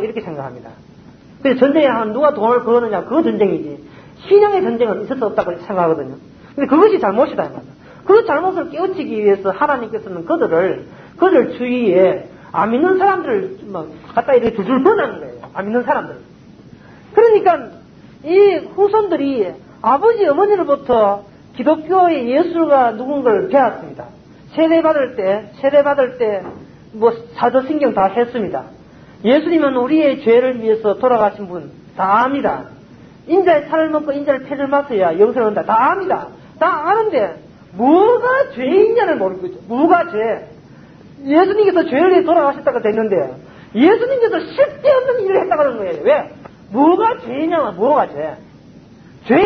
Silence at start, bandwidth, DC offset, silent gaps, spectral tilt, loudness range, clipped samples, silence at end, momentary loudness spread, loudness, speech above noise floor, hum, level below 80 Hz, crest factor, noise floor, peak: 0 s; 6.2 kHz; under 0.1%; none; -8 dB/octave; 2 LU; under 0.1%; 0 s; 13 LU; -15 LUFS; 27 dB; none; -54 dBFS; 16 dB; -41 dBFS; 0 dBFS